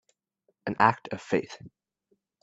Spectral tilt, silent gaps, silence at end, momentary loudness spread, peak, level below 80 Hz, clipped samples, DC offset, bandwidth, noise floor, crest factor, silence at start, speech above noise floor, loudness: -6 dB/octave; none; 0.75 s; 19 LU; -4 dBFS; -68 dBFS; under 0.1%; under 0.1%; 8 kHz; -75 dBFS; 26 dB; 0.65 s; 47 dB; -27 LUFS